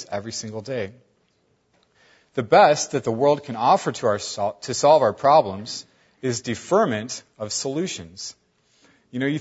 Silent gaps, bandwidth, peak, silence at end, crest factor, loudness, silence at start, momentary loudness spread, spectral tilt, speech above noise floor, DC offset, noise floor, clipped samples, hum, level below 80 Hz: none; 8 kHz; -2 dBFS; 0 s; 20 dB; -21 LUFS; 0 s; 16 LU; -4 dB/octave; 45 dB; under 0.1%; -66 dBFS; under 0.1%; none; -66 dBFS